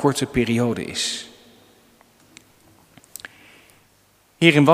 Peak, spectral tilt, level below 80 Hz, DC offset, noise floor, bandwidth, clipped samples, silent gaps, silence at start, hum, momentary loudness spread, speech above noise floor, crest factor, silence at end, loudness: 0 dBFS; -5 dB/octave; -50 dBFS; under 0.1%; -58 dBFS; 15.5 kHz; under 0.1%; none; 0 s; none; 25 LU; 40 dB; 22 dB; 0 s; -20 LUFS